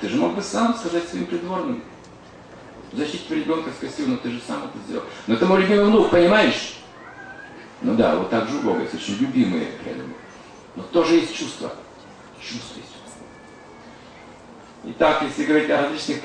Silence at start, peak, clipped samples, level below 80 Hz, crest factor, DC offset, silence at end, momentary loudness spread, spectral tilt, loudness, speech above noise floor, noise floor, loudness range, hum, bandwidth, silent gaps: 0 s; -4 dBFS; under 0.1%; -54 dBFS; 18 dB; under 0.1%; 0 s; 24 LU; -5 dB/octave; -21 LUFS; 23 dB; -44 dBFS; 9 LU; none; 10 kHz; none